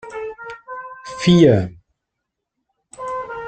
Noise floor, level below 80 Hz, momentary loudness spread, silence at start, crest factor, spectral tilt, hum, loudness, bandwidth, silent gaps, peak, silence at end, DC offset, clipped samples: -79 dBFS; -52 dBFS; 21 LU; 0.05 s; 18 dB; -7 dB/octave; none; -16 LUFS; 9 kHz; none; -2 dBFS; 0 s; under 0.1%; under 0.1%